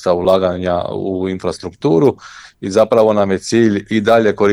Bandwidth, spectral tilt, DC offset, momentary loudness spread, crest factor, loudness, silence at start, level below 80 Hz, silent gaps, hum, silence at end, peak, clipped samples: 13.5 kHz; -6 dB/octave; under 0.1%; 9 LU; 14 dB; -15 LUFS; 0 s; -48 dBFS; none; none; 0 s; 0 dBFS; under 0.1%